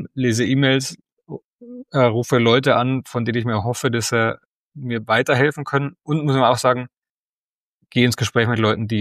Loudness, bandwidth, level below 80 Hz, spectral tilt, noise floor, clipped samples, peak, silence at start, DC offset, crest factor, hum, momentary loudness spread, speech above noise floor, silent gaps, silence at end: -19 LUFS; 15.5 kHz; -58 dBFS; -5.5 dB/octave; under -90 dBFS; under 0.1%; -2 dBFS; 0 s; under 0.1%; 18 dB; none; 15 LU; over 72 dB; 1.12-1.17 s, 1.44-1.58 s, 4.45-4.70 s, 6.98-7.02 s, 7.10-7.80 s; 0 s